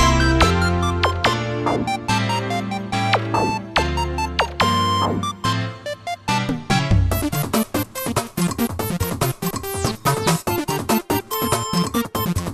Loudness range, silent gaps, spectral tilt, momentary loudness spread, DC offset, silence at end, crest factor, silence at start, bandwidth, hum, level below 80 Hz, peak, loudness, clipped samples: 2 LU; none; -4.5 dB/octave; 6 LU; under 0.1%; 0 s; 20 dB; 0 s; 14.5 kHz; none; -32 dBFS; 0 dBFS; -21 LUFS; under 0.1%